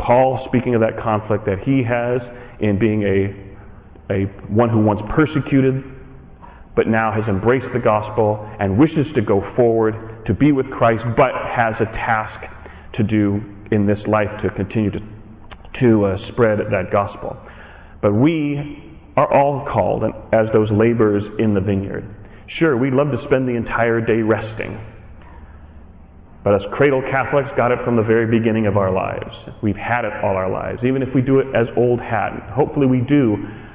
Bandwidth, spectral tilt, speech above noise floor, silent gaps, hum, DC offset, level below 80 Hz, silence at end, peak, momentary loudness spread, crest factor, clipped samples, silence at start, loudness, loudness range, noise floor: 4 kHz; -11.5 dB/octave; 24 dB; none; none; under 0.1%; -40 dBFS; 0 s; -6 dBFS; 10 LU; 12 dB; under 0.1%; 0 s; -18 LUFS; 3 LU; -41 dBFS